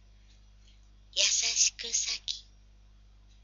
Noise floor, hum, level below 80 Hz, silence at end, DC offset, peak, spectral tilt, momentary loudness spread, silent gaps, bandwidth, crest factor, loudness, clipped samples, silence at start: -57 dBFS; 50 Hz at -55 dBFS; -58 dBFS; 1 s; under 0.1%; -8 dBFS; 2.5 dB/octave; 12 LU; none; 8 kHz; 26 dB; -27 LUFS; under 0.1%; 1.15 s